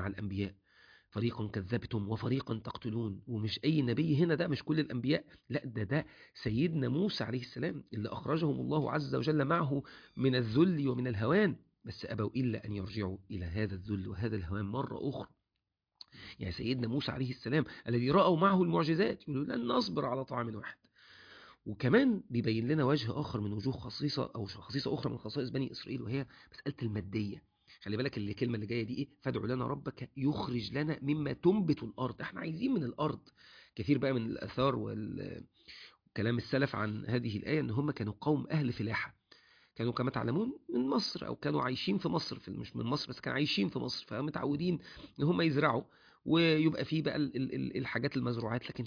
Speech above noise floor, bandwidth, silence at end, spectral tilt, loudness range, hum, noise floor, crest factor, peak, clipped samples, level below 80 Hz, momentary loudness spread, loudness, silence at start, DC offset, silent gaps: 54 dB; 5.4 kHz; 0 s; -5.5 dB/octave; 6 LU; none; -87 dBFS; 20 dB; -14 dBFS; under 0.1%; -62 dBFS; 12 LU; -34 LUFS; 0 s; under 0.1%; none